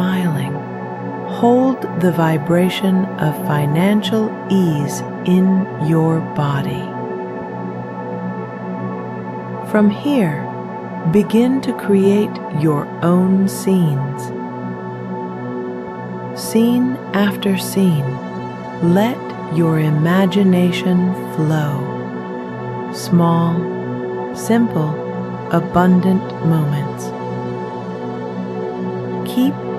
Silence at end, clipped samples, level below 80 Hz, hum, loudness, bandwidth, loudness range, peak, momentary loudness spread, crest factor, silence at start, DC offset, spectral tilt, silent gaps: 0 s; under 0.1%; -54 dBFS; none; -18 LUFS; 14 kHz; 5 LU; -2 dBFS; 12 LU; 16 dB; 0 s; under 0.1%; -7 dB/octave; none